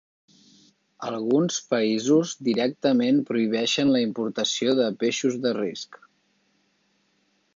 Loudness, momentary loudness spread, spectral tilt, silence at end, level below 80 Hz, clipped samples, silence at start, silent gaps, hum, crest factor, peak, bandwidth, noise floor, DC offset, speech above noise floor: -24 LUFS; 9 LU; -4.5 dB/octave; 1.6 s; -72 dBFS; under 0.1%; 1 s; none; none; 16 dB; -8 dBFS; 7.6 kHz; -68 dBFS; under 0.1%; 45 dB